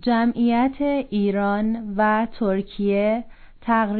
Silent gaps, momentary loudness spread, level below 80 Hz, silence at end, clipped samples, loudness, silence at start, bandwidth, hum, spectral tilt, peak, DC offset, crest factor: none; 4 LU; -46 dBFS; 0 s; under 0.1%; -22 LUFS; 0 s; 4.5 kHz; none; -10.5 dB/octave; -8 dBFS; under 0.1%; 12 dB